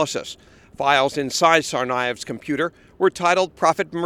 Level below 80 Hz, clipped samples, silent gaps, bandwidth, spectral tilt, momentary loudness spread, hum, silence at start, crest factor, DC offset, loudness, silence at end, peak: -58 dBFS; under 0.1%; none; 16 kHz; -3.5 dB/octave; 12 LU; none; 0 s; 20 dB; under 0.1%; -20 LUFS; 0 s; 0 dBFS